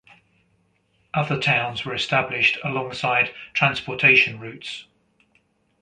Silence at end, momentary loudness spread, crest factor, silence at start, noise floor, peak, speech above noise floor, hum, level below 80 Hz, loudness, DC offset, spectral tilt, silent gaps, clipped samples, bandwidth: 1 s; 18 LU; 20 dB; 1.15 s; -65 dBFS; -4 dBFS; 43 dB; none; -60 dBFS; -20 LUFS; under 0.1%; -4.5 dB/octave; none; under 0.1%; 10.5 kHz